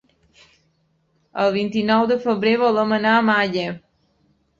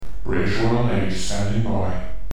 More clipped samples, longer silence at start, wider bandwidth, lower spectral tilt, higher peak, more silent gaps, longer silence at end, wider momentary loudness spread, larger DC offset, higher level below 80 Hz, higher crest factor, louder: neither; first, 1.35 s vs 0 s; second, 7.4 kHz vs 12.5 kHz; about the same, -6.5 dB/octave vs -6 dB/octave; first, -4 dBFS vs -8 dBFS; neither; first, 0.8 s vs 0 s; first, 11 LU vs 6 LU; second, under 0.1% vs 10%; second, -62 dBFS vs -32 dBFS; first, 18 dB vs 12 dB; first, -19 LUFS vs -23 LUFS